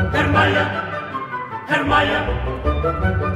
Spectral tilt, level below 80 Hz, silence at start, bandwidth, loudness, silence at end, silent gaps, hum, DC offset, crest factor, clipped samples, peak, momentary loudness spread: -6.5 dB/octave; -30 dBFS; 0 s; 11.5 kHz; -19 LUFS; 0 s; none; none; under 0.1%; 16 dB; under 0.1%; -2 dBFS; 11 LU